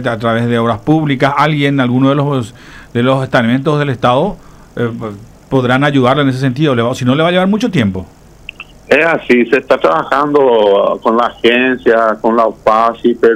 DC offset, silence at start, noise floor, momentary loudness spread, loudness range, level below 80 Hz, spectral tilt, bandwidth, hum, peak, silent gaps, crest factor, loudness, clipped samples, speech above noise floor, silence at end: under 0.1%; 0 s; -33 dBFS; 9 LU; 3 LU; -44 dBFS; -7 dB/octave; 13.5 kHz; none; 0 dBFS; none; 12 dB; -12 LUFS; under 0.1%; 21 dB; 0 s